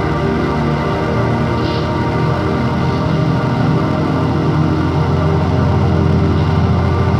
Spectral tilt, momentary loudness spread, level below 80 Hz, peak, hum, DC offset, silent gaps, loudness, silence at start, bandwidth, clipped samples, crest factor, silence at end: -8 dB/octave; 3 LU; -30 dBFS; -2 dBFS; none; under 0.1%; none; -15 LUFS; 0 s; 8.6 kHz; under 0.1%; 12 dB; 0 s